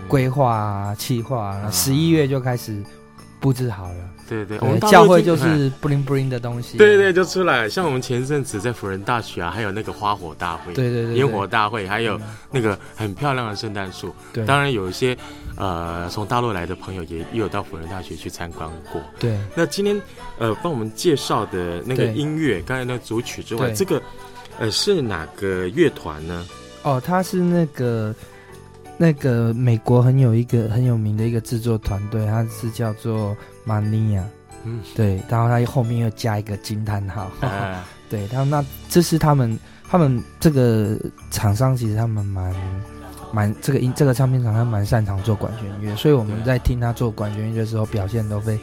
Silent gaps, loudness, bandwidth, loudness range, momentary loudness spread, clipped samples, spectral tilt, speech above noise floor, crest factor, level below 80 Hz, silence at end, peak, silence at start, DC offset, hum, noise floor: none; -20 LUFS; 17 kHz; 7 LU; 13 LU; under 0.1%; -6 dB/octave; 22 dB; 20 dB; -42 dBFS; 0 s; 0 dBFS; 0 s; under 0.1%; none; -42 dBFS